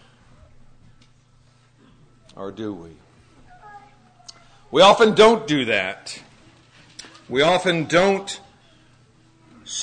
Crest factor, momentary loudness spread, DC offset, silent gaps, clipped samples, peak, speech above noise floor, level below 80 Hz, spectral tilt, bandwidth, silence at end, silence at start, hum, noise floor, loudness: 22 dB; 25 LU; under 0.1%; none; under 0.1%; -2 dBFS; 37 dB; -54 dBFS; -4 dB/octave; 9.6 kHz; 0 s; 2.4 s; none; -55 dBFS; -17 LUFS